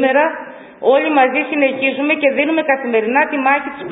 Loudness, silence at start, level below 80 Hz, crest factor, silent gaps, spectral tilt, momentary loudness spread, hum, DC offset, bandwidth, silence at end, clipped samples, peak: -15 LUFS; 0 s; -64 dBFS; 16 dB; none; -9 dB/octave; 5 LU; none; under 0.1%; 4 kHz; 0 s; under 0.1%; 0 dBFS